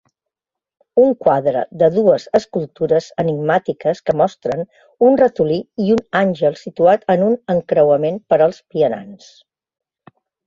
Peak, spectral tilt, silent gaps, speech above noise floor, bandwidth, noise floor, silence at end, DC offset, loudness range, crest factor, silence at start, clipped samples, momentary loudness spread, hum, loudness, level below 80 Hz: -2 dBFS; -7.5 dB/octave; none; 69 dB; 7.4 kHz; -85 dBFS; 1.3 s; under 0.1%; 2 LU; 16 dB; 0.95 s; under 0.1%; 7 LU; none; -16 LUFS; -56 dBFS